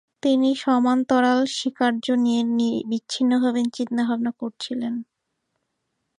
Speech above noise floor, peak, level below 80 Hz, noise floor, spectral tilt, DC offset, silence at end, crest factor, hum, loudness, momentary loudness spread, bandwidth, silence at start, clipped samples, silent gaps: 55 dB; -6 dBFS; -72 dBFS; -77 dBFS; -4 dB/octave; under 0.1%; 1.15 s; 16 dB; none; -22 LUFS; 9 LU; 10.5 kHz; 0.25 s; under 0.1%; none